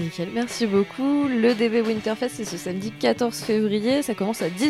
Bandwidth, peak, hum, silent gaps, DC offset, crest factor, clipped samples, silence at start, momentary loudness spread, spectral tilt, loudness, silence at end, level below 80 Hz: 15 kHz; -8 dBFS; none; none; under 0.1%; 16 dB; under 0.1%; 0 s; 8 LU; -5 dB/octave; -23 LUFS; 0 s; -60 dBFS